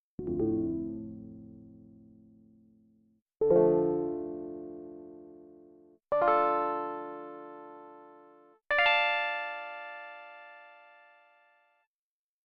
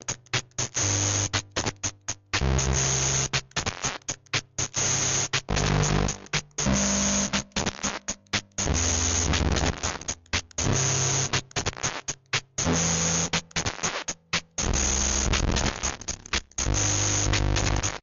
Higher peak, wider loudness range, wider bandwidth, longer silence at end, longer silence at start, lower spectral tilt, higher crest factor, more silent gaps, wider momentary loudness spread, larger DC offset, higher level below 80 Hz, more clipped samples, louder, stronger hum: about the same, -12 dBFS vs -12 dBFS; first, 7 LU vs 2 LU; second, 6 kHz vs 7.8 kHz; first, 1.7 s vs 0.05 s; first, 0.2 s vs 0 s; about the same, -3 dB/octave vs -2.5 dB/octave; first, 20 dB vs 14 dB; first, 3.22-3.26 s vs none; first, 25 LU vs 7 LU; neither; second, -64 dBFS vs -36 dBFS; neither; second, -29 LUFS vs -25 LUFS; neither